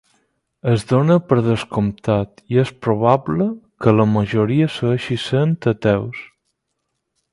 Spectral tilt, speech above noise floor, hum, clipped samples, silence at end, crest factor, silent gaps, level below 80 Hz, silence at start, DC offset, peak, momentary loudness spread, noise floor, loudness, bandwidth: -8 dB/octave; 58 dB; none; under 0.1%; 1.05 s; 18 dB; none; -48 dBFS; 0.65 s; under 0.1%; 0 dBFS; 6 LU; -75 dBFS; -18 LUFS; 11.5 kHz